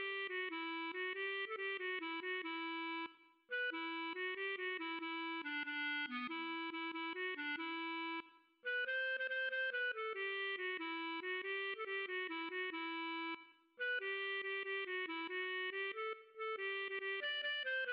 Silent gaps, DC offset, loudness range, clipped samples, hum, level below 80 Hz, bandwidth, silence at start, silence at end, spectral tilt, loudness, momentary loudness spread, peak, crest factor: none; under 0.1%; 2 LU; under 0.1%; none; under -90 dBFS; 5.6 kHz; 0 s; 0 s; 3 dB/octave; -41 LUFS; 4 LU; -32 dBFS; 10 dB